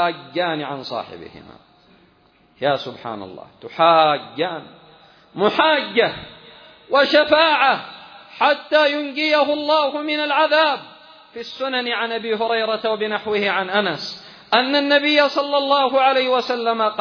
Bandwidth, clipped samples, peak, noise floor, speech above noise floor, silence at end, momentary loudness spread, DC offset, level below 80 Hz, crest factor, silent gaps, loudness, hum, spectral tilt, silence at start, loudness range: 5.4 kHz; under 0.1%; -2 dBFS; -56 dBFS; 37 dB; 0 s; 19 LU; under 0.1%; -64 dBFS; 18 dB; none; -18 LUFS; none; -4.5 dB/octave; 0 s; 4 LU